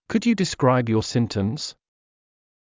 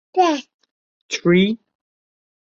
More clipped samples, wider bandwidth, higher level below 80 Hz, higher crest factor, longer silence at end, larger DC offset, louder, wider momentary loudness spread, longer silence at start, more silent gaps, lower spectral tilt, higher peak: neither; about the same, 7.6 kHz vs 7.6 kHz; first, -50 dBFS vs -62 dBFS; about the same, 16 dB vs 18 dB; about the same, 0.9 s vs 1 s; neither; second, -22 LUFS vs -19 LUFS; second, 9 LU vs 12 LU; about the same, 0.1 s vs 0.15 s; second, none vs 0.54-0.59 s, 0.71-1.09 s; about the same, -6 dB/octave vs -5.5 dB/octave; about the same, -6 dBFS vs -4 dBFS